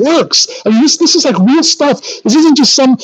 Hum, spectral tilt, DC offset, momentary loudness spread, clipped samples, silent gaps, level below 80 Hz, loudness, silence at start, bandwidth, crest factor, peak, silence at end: none; -3.5 dB/octave; under 0.1%; 5 LU; under 0.1%; none; -66 dBFS; -8 LUFS; 0 s; 9 kHz; 8 dB; 0 dBFS; 0 s